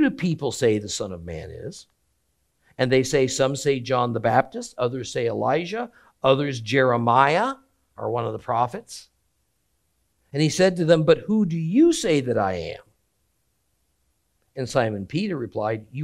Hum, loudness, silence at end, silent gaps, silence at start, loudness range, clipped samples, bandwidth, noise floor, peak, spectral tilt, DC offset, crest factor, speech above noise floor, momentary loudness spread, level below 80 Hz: none; -22 LUFS; 0 s; none; 0 s; 7 LU; under 0.1%; 13 kHz; -71 dBFS; -2 dBFS; -5.5 dB/octave; under 0.1%; 22 dB; 49 dB; 16 LU; -56 dBFS